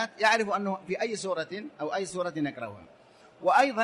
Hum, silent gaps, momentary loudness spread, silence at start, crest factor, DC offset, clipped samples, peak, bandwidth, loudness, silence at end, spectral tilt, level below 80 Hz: none; none; 12 LU; 0 s; 20 dB; under 0.1%; under 0.1%; -8 dBFS; 11.5 kHz; -29 LUFS; 0 s; -4 dB/octave; -72 dBFS